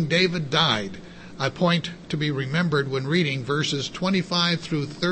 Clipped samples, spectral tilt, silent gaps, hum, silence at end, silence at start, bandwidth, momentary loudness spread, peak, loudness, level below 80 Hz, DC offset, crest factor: under 0.1%; -5 dB/octave; none; none; 0 s; 0 s; 8.8 kHz; 8 LU; -6 dBFS; -23 LUFS; -56 dBFS; under 0.1%; 18 dB